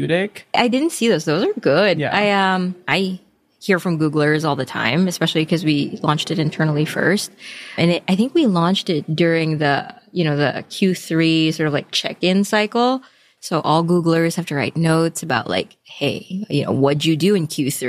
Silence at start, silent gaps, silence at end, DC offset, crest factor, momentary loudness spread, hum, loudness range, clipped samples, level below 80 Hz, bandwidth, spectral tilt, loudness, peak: 0 s; none; 0 s; under 0.1%; 16 dB; 7 LU; none; 1 LU; under 0.1%; -62 dBFS; 15.5 kHz; -5.5 dB/octave; -18 LUFS; -2 dBFS